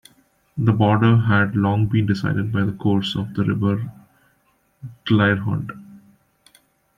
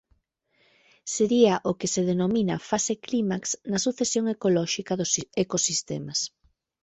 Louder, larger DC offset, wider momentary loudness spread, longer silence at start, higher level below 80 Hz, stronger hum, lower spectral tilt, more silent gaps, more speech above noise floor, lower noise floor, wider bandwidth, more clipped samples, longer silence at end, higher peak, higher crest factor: first, -20 LUFS vs -25 LUFS; neither; first, 18 LU vs 8 LU; second, 0.55 s vs 1.05 s; first, -54 dBFS vs -64 dBFS; neither; first, -8 dB/octave vs -4 dB/octave; neither; about the same, 45 dB vs 44 dB; second, -63 dBFS vs -70 dBFS; second, 7.2 kHz vs 8.4 kHz; neither; first, 1 s vs 0.55 s; about the same, -4 dBFS vs -6 dBFS; about the same, 18 dB vs 20 dB